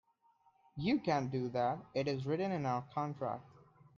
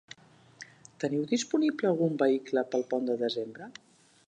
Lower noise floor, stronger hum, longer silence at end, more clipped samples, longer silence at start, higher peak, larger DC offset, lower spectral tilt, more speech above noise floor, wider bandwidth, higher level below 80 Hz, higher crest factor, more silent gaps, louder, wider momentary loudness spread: first, -72 dBFS vs -55 dBFS; neither; about the same, 0.5 s vs 0.6 s; neither; first, 0.75 s vs 0.6 s; second, -20 dBFS vs -12 dBFS; neither; first, -7.5 dB/octave vs -5.5 dB/octave; first, 36 dB vs 27 dB; second, 7.2 kHz vs 10 kHz; first, -72 dBFS vs -82 dBFS; about the same, 18 dB vs 18 dB; neither; second, -37 LUFS vs -29 LUFS; second, 7 LU vs 22 LU